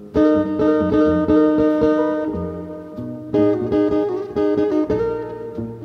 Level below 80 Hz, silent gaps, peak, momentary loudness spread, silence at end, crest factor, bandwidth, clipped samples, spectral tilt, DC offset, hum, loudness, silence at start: -42 dBFS; none; -4 dBFS; 14 LU; 0 s; 14 dB; 6.2 kHz; under 0.1%; -9 dB/octave; under 0.1%; none; -18 LUFS; 0 s